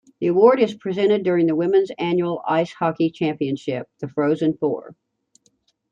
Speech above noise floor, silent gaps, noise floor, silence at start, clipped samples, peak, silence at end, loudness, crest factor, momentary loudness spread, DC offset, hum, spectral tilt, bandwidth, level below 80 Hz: 45 dB; none; -65 dBFS; 0.2 s; under 0.1%; -2 dBFS; 1 s; -20 LUFS; 18 dB; 10 LU; under 0.1%; none; -7.5 dB/octave; 7.6 kHz; -68 dBFS